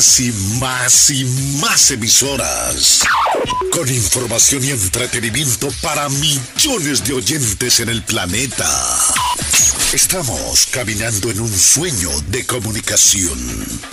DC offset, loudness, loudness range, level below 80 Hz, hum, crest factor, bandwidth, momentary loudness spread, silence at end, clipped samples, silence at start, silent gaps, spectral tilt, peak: under 0.1%; -13 LUFS; 3 LU; -36 dBFS; none; 14 dB; 16 kHz; 8 LU; 0 s; under 0.1%; 0 s; none; -2 dB/octave; -2 dBFS